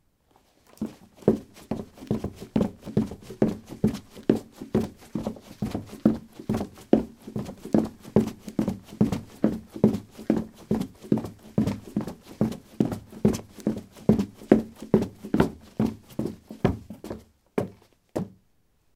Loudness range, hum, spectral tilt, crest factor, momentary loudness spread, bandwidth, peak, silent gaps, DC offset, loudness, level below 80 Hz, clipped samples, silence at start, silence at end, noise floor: 4 LU; none; -8 dB/octave; 28 dB; 11 LU; 15.5 kHz; 0 dBFS; none; under 0.1%; -28 LUFS; -50 dBFS; under 0.1%; 0.8 s; 0.65 s; -65 dBFS